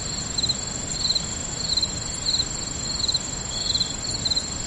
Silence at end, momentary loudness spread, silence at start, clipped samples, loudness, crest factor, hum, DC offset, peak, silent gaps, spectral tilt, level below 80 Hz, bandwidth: 0 s; 4 LU; 0 s; under 0.1%; -23 LUFS; 16 dB; none; under 0.1%; -12 dBFS; none; -1.5 dB/octave; -40 dBFS; 11.5 kHz